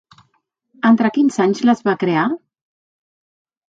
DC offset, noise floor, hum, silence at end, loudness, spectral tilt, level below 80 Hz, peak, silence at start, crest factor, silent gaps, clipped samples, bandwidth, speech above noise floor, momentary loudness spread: under 0.1%; -66 dBFS; none; 1.3 s; -16 LUFS; -6.5 dB/octave; -66 dBFS; -2 dBFS; 0.85 s; 18 dB; none; under 0.1%; 7.8 kHz; 51 dB; 6 LU